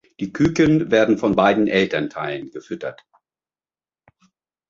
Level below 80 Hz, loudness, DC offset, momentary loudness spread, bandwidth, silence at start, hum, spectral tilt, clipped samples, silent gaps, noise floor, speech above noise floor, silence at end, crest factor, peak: -50 dBFS; -18 LUFS; under 0.1%; 15 LU; 7.4 kHz; 0.2 s; none; -6.5 dB/octave; under 0.1%; none; under -90 dBFS; over 71 dB; 1.75 s; 18 dB; -2 dBFS